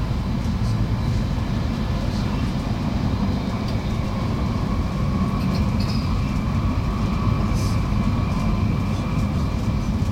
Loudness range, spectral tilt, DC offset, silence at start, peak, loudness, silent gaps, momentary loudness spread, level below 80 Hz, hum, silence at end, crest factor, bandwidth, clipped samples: 2 LU; -7.5 dB/octave; under 0.1%; 0 s; -8 dBFS; -23 LUFS; none; 2 LU; -28 dBFS; none; 0 s; 14 dB; 15.5 kHz; under 0.1%